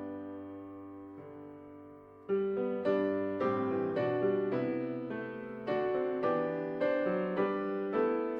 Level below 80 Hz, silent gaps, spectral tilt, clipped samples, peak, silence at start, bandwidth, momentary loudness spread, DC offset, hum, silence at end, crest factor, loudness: -74 dBFS; none; -9 dB/octave; under 0.1%; -18 dBFS; 0 s; 5.4 kHz; 17 LU; under 0.1%; none; 0 s; 14 dB; -33 LUFS